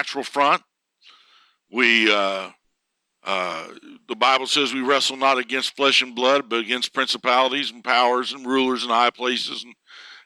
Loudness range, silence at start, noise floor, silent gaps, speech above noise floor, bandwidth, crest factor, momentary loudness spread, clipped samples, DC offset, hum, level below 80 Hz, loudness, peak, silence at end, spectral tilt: 3 LU; 0 s; -77 dBFS; none; 55 dB; 15 kHz; 20 dB; 13 LU; under 0.1%; under 0.1%; none; -82 dBFS; -20 LUFS; -2 dBFS; 0.1 s; -1.5 dB/octave